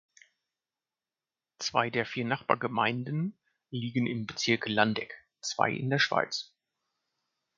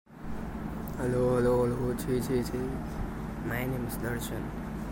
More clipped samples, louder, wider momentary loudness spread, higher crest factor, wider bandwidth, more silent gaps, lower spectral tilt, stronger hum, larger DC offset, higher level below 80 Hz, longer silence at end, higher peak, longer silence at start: neither; about the same, -30 LUFS vs -32 LUFS; about the same, 11 LU vs 11 LU; first, 26 dB vs 14 dB; second, 7.6 kHz vs 16.5 kHz; neither; second, -4.5 dB/octave vs -7 dB/octave; neither; neither; second, -72 dBFS vs -42 dBFS; first, 1.1 s vs 0 s; first, -6 dBFS vs -16 dBFS; first, 1.6 s vs 0.1 s